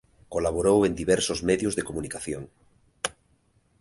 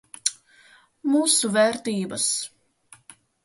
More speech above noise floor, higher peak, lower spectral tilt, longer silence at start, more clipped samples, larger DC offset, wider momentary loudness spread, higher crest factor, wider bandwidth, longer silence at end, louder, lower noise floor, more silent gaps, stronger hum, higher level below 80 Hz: first, 40 dB vs 33 dB; second, -8 dBFS vs -4 dBFS; first, -4.5 dB/octave vs -2.5 dB/octave; about the same, 0.3 s vs 0.25 s; neither; neither; about the same, 12 LU vs 10 LU; about the same, 20 dB vs 22 dB; about the same, 11.5 kHz vs 12 kHz; second, 0.7 s vs 1 s; second, -26 LUFS vs -22 LUFS; first, -66 dBFS vs -55 dBFS; neither; neither; first, -48 dBFS vs -70 dBFS